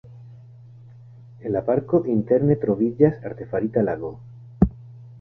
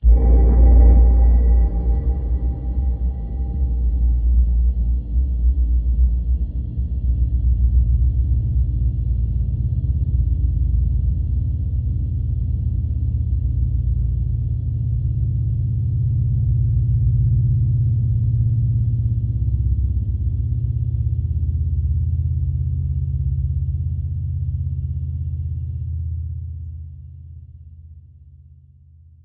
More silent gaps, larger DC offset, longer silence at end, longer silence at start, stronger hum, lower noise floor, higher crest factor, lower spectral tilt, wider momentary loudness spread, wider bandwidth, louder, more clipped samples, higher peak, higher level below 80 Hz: neither; neither; second, 0 s vs 0.9 s; about the same, 0.05 s vs 0 s; neither; about the same, -45 dBFS vs -47 dBFS; first, 20 dB vs 14 dB; second, -12.5 dB/octave vs -14.5 dB/octave; first, 15 LU vs 8 LU; first, 2.9 kHz vs 1.1 kHz; about the same, -22 LUFS vs -21 LUFS; neither; about the same, -2 dBFS vs -4 dBFS; second, -42 dBFS vs -20 dBFS